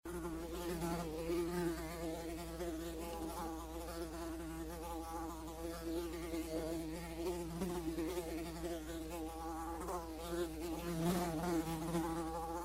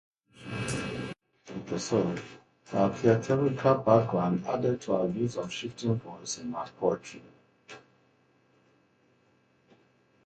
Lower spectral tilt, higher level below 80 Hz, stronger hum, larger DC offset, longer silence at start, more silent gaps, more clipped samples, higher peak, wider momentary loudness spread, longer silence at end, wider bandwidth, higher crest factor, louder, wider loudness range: about the same, -5.5 dB/octave vs -6 dB/octave; first, -52 dBFS vs -62 dBFS; neither; neither; second, 0.05 s vs 0.4 s; neither; neither; second, -24 dBFS vs -8 dBFS; second, 7 LU vs 23 LU; second, 0 s vs 2.45 s; first, 16 kHz vs 11.5 kHz; second, 18 dB vs 24 dB; second, -43 LUFS vs -29 LUFS; second, 4 LU vs 11 LU